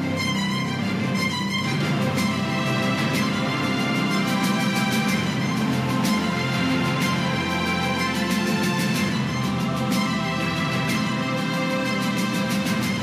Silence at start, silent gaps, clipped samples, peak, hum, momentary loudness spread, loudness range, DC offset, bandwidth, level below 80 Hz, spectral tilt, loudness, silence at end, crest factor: 0 s; none; under 0.1%; -10 dBFS; none; 2 LU; 1 LU; under 0.1%; 15.5 kHz; -54 dBFS; -5 dB/octave; -23 LUFS; 0 s; 12 dB